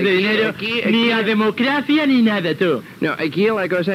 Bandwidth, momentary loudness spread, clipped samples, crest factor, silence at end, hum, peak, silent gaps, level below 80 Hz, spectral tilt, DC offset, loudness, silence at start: 15 kHz; 5 LU; under 0.1%; 12 dB; 0 s; none; -6 dBFS; none; -66 dBFS; -6.5 dB/octave; under 0.1%; -17 LUFS; 0 s